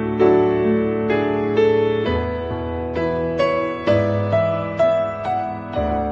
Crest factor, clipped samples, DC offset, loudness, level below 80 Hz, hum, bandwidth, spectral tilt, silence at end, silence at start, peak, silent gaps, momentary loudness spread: 14 dB; under 0.1%; under 0.1%; -20 LUFS; -38 dBFS; none; 7.4 kHz; -8.5 dB/octave; 0 s; 0 s; -4 dBFS; none; 8 LU